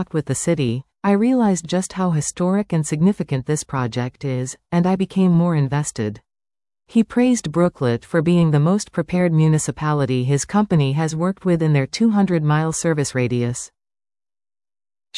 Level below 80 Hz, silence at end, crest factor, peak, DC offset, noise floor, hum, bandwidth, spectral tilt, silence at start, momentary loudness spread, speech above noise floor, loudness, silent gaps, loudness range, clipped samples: -52 dBFS; 0 s; 14 dB; -6 dBFS; under 0.1%; under -90 dBFS; none; 12 kHz; -6.5 dB/octave; 0 s; 7 LU; over 72 dB; -19 LUFS; none; 3 LU; under 0.1%